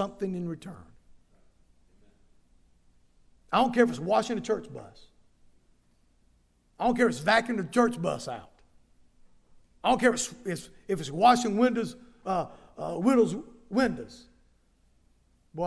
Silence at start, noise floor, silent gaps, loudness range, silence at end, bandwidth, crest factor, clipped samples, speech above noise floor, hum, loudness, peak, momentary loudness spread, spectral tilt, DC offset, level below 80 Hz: 0 s; -65 dBFS; none; 5 LU; 0 s; 11 kHz; 22 dB; under 0.1%; 39 dB; none; -27 LUFS; -8 dBFS; 17 LU; -5 dB/octave; under 0.1%; -58 dBFS